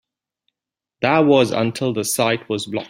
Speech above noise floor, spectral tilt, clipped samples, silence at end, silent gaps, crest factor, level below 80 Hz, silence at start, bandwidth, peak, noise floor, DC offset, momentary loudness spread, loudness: 68 dB; -4.5 dB/octave; under 0.1%; 0 s; none; 18 dB; -60 dBFS; 1 s; 16 kHz; -2 dBFS; -86 dBFS; under 0.1%; 9 LU; -18 LUFS